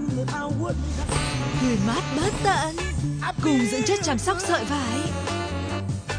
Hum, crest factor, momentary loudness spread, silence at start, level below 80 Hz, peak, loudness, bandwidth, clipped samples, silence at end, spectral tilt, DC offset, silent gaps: none; 14 dB; 6 LU; 0 s; -36 dBFS; -10 dBFS; -25 LUFS; 10.5 kHz; under 0.1%; 0 s; -5 dB/octave; under 0.1%; none